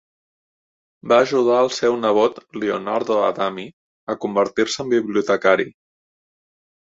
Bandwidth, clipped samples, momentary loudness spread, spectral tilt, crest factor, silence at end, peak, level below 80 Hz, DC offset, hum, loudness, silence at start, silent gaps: 7.8 kHz; under 0.1%; 13 LU; -4.5 dB/octave; 20 dB; 1.15 s; -2 dBFS; -64 dBFS; under 0.1%; none; -19 LUFS; 1.05 s; 3.73-4.07 s